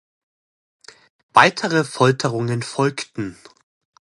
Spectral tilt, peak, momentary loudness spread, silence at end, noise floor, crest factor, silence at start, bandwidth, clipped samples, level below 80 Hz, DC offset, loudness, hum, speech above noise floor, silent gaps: -5 dB/octave; 0 dBFS; 15 LU; 0.75 s; under -90 dBFS; 22 dB; 1.35 s; 11.5 kHz; under 0.1%; -62 dBFS; under 0.1%; -19 LUFS; none; over 71 dB; none